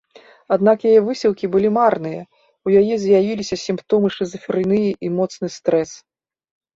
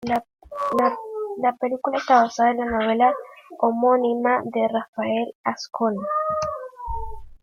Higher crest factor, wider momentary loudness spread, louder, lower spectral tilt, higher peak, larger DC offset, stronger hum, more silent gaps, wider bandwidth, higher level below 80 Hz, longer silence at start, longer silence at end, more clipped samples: about the same, 16 dB vs 18 dB; second, 10 LU vs 14 LU; first, -18 LUFS vs -22 LUFS; about the same, -6.5 dB/octave vs -5.5 dB/octave; about the same, -2 dBFS vs -4 dBFS; neither; neither; second, none vs 4.88-4.93 s, 5.35-5.44 s; second, 7.8 kHz vs 12 kHz; second, -56 dBFS vs -46 dBFS; first, 0.5 s vs 0 s; first, 0.8 s vs 0.1 s; neither